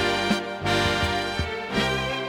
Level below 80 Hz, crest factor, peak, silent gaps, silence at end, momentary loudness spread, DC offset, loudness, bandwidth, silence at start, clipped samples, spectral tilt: -42 dBFS; 16 dB; -8 dBFS; none; 0 s; 5 LU; under 0.1%; -24 LUFS; 16.5 kHz; 0 s; under 0.1%; -4.5 dB/octave